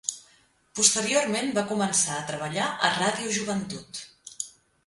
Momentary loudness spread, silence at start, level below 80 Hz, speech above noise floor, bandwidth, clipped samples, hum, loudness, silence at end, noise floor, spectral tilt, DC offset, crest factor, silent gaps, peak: 17 LU; 0.05 s; -66 dBFS; 35 dB; 11.5 kHz; under 0.1%; none; -25 LUFS; 0.35 s; -62 dBFS; -2 dB/octave; under 0.1%; 24 dB; none; -4 dBFS